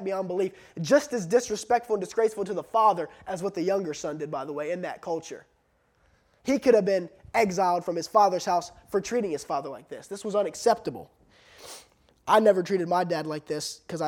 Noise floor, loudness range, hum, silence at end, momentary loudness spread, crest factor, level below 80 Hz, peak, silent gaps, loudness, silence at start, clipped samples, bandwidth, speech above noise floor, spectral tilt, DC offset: -68 dBFS; 6 LU; none; 0 s; 14 LU; 18 dB; -66 dBFS; -8 dBFS; none; -26 LUFS; 0 s; under 0.1%; 17 kHz; 42 dB; -4.5 dB/octave; under 0.1%